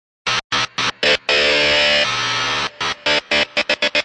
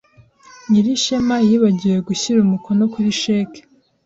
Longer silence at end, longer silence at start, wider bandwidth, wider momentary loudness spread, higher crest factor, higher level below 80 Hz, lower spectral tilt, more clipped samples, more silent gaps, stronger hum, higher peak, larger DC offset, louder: second, 0 s vs 0.45 s; second, 0.25 s vs 0.7 s; first, 11.5 kHz vs 8 kHz; about the same, 7 LU vs 5 LU; about the same, 16 dB vs 12 dB; first, -48 dBFS vs -54 dBFS; second, -1.5 dB/octave vs -5.5 dB/octave; neither; first, 0.44-0.50 s vs none; neither; about the same, -2 dBFS vs -4 dBFS; neither; about the same, -16 LUFS vs -17 LUFS